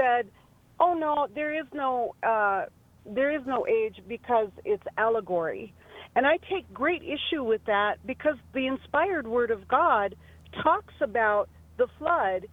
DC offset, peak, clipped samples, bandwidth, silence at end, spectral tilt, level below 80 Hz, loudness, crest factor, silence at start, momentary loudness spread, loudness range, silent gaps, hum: under 0.1%; -10 dBFS; under 0.1%; 6.4 kHz; 0.05 s; -6.5 dB/octave; -58 dBFS; -27 LUFS; 18 dB; 0 s; 9 LU; 2 LU; none; none